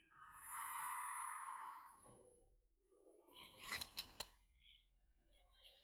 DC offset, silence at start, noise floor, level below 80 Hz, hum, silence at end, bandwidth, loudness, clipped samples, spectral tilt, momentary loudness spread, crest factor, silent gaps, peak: under 0.1%; 0 s; -77 dBFS; -78 dBFS; none; 0 s; over 20 kHz; -50 LUFS; under 0.1%; 0 dB/octave; 21 LU; 24 dB; none; -32 dBFS